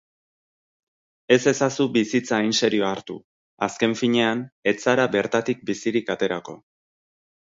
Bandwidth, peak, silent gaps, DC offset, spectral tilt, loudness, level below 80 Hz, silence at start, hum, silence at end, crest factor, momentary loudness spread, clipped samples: 7.8 kHz; -2 dBFS; 3.24-3.57 s, 4.52-4.62 s; under 0.1%; -4.5 dB/octave; -22 LUFS; -66 dBFS; 1.3 s; none; 0.9 s; 20 dB; 9 LU; under 0.1%